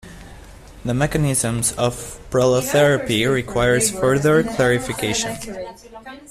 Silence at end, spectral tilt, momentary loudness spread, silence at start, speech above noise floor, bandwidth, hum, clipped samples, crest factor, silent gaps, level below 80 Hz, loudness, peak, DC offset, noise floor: 0.1 s; -4.5 dB/octave; 16 LU; 0.05 s; 21 dB; 15.5 kHz; none; under 0.1%; 16 dB; none; -40 dBFS; -18 LUFS; -4 dBFS; under 0.1%; -40 dBFS